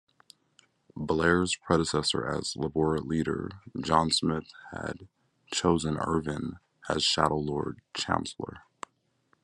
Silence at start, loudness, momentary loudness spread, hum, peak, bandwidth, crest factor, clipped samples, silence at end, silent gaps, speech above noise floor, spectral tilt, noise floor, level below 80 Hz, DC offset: 0.95 s; -29 LUFS; 17 LU; none; -6 dBFS; 12 kHz; 24 dB; under 0.1%; 0.85 s; none; 42 dB; -4.5 dB/octave; -71 dBFS; -56 dBFS; under 0.1%